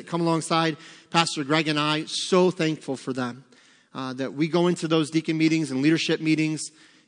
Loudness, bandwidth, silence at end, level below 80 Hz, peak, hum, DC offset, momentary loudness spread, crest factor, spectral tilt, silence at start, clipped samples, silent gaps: -24 LUFS; 10.5 kHz; 0.4 s; -78 dBFS; -4 dBFS; none; under 0.1%; 10 LU; 22 dB; -5 dB/octave; 0 s; under 0.1%; none